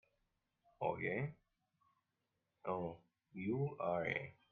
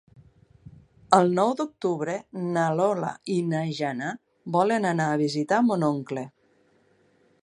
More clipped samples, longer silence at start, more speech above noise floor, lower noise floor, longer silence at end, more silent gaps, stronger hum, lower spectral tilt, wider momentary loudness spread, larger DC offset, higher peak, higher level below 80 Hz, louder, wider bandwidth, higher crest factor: neither; first, 0.8 s vs 0.65 s; first, 47 dB vs 39 dB; first, -88 dBFS vs -64 dBFS; second, 0.2 s vs 1.15 s; neither; neither; first, -9 dB/octave vs -6.5 dB/octave; about the same, 10 LU vs 11 LU; neither; second, -24 dBFS vs -2 dBFS; second, -76 dBFS vs -70 dBFS; second, -42 LUFS vs -25 LUFS; second, 6.6 kHz vs 11 kHz; second, 20 dB vs 26 dB